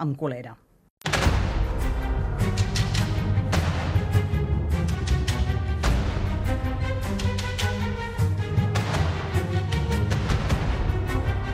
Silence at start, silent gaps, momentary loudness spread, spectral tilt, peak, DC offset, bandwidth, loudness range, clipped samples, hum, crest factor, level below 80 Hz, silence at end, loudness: 0 s; 0.90-0.97 s; 4 LU; -6 dB/octave; -8 dBFS; under 0.1%; 16 kHz; 1 LU; under 0.1%; none; 16 dB; -30 dBFS; 0 s; -26 LUFS